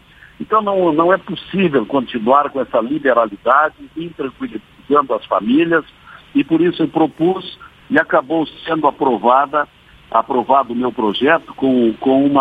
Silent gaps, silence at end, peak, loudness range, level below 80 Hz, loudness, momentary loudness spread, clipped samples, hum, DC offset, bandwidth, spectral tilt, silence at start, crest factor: none; 0 s; 0 dBFS; 2 LU; -54 dBFS; -16 LUFS; 11 LU; under 0.1%; none; under 0.1%; 4.9 kHz; -8 dB/octave; 0.4 s; 16 dB